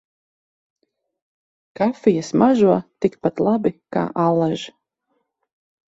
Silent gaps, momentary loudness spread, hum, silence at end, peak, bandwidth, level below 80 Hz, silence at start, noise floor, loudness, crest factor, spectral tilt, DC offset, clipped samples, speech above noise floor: none; 8 LU; none; 1.25 s; -2 dBFS; 8 kHz; -60 dBFS; 1.8 s; -72 dBFS; -19 LUFS; 18 dB; -7.5 dB/octave; under 0.1%; under 0.1%; 53 dB